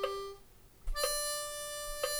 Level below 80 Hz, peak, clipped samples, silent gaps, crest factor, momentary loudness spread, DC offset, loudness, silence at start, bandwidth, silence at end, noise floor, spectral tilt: -46 dBFS; -18 dBFS; under 0.1%; none; 20 dB; 17 LU; under 0.1%; -36 LUFS; 0 s; over 20 kHz; 0 s; -57 dBFS; -0.5 dB/octave